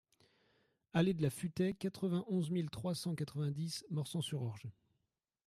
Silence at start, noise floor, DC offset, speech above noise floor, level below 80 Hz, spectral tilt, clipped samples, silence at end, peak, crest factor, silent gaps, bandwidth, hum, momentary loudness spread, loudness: 0.95 s; -87 dBFS; under 0.1%; 49 dB; -72 dBFS; -6.5 dB/octave; under 0.1%; 0.75 s; -22 dBFS; 18 dB; none; 15 kHz; none; 7 LU; -39 LUFS